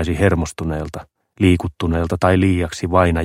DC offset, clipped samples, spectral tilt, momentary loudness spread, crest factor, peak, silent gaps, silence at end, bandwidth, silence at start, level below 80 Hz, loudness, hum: under 0.1%; under 0.1%; -7 dB/octave; 10 LU; 16 dB; 0 dBFS; none; 0 s; 14 kHz; 0 s; -32 dBFS; -18 LUFS; none